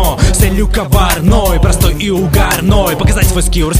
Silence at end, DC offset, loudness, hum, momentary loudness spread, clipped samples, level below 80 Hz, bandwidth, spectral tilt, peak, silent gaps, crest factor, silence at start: 0 s; under 0.1%; -11 LUFS; none; 2 LU; 0.2%; -14 dBFS; 16.5 kHz; -5 dB/octave; 0 dBFS; none; 10 dB; 0 s